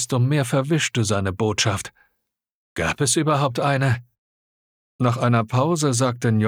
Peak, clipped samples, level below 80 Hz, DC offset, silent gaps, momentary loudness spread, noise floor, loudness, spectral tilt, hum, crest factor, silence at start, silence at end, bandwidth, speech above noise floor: -6 dBFS; under 0.1%; -52 dBFS; under 0.1%; 2.54-2.76 s, 4.18-4.99 s; 6 LU; -77 dBFS; -21 LUFS; -5 dB/octave; none; 16 dB; 0 s; 0 s; 15.5 kHz; 57 dB